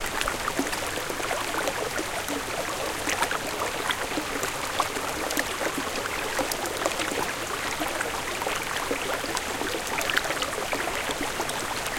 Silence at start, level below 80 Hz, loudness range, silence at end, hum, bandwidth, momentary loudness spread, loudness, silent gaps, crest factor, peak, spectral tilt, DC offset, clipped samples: 0 s; -48 dBFS; 1 LU; 0 s; none; 17 kHz; 3 LU; -28 LUFS; none; 24 dB; -4 dBFS; -2 dB/octave; under 0.1%; under 0.1%